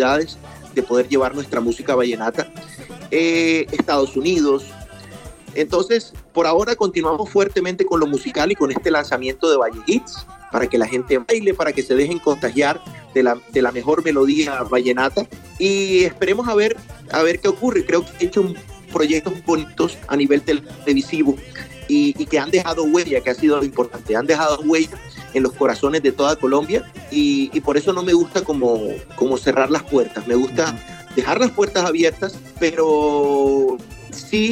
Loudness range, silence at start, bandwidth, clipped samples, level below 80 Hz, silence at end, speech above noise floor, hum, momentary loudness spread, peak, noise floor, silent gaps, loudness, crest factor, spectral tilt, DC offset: 2 LU; 0 s; 15.5 kHz; under 0.1%; -46 dBFS; 0 s; 20 dB; none; 9 LU; -2 dBFS; -38 dBFS; none; -19 LUFS; 16 dB; -4.5 dB/octave; under 0.1%